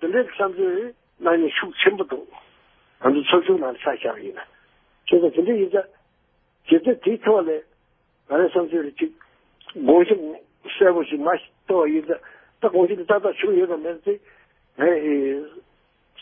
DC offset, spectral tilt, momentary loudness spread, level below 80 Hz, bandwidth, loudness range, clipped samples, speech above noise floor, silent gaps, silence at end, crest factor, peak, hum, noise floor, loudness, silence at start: under 0.1%; -9.5 dB/octave; 13 LU; -66 dBFS; 3.7 kHz; 2 LU; under 0.1%; 45 dB; none; 0 s; 20 dB; -2 dBFS; none; -65 dBFS; -21 LUFS; 0 s